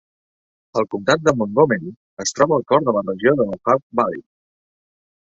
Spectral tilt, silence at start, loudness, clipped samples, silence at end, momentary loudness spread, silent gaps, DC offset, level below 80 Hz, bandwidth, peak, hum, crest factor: -5 dB/octave; 0.75 s; -19 LUFS; under 0.1%; 1.1 s; 8 LU; 1.96-2.17 s, 3.83-3.90 s; under 0.1%; -58 dBFS; 8.2 kHz; -2 dBFS; none; 20 dB